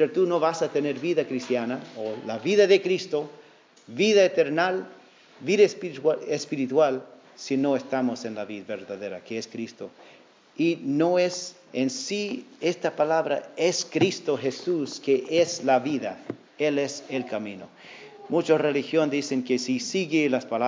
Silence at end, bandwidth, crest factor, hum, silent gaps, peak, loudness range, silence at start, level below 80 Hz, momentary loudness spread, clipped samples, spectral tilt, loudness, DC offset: 0 s; 7.6 kHz; 20 dB; none; none; -6 dBFS; 5 LU; 0 s; -78 dBFS; 14 LU; under 0.1%; -4.5 dB/octave; -25 LUFS; under 0.1%